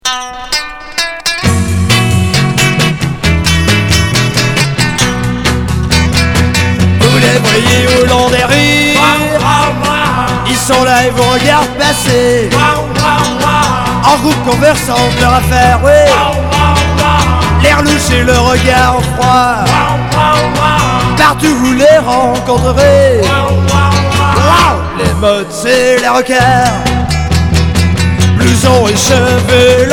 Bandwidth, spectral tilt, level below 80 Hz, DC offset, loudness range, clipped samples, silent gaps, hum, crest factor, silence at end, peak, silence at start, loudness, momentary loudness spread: 18.5 kHz; -4.5 dB/octave; -22 dBFS; under 0.1%; 2 LU; 0.7%; none; none; 8 dB; 0 s; 0 dBFS; 0.05 s; -9 LUFS; 5 LU